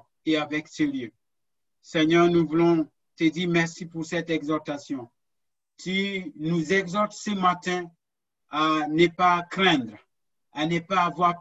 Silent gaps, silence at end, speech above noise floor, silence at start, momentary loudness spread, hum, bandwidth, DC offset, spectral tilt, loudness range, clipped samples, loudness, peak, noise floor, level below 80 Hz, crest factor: none; 0 s; 63 dB; 0.25 s; 14 LU; none; 8 kHz; under 0.1%; -5.5 dB/octave; 5 LU; under 0.1%; -25 LUFS; -6 dBFS; -87 dBFS; -64 dBFS; 18 dB